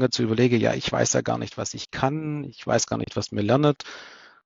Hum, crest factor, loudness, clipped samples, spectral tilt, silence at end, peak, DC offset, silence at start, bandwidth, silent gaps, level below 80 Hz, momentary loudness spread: none; 18 dB; -24 LUFS; under 0.1%; -4.5 dB/octave; 0.3 s; -6 dBFS; under 0.1%; 0 s; 7.8 kHz; none; -54 dBFS; 11 LU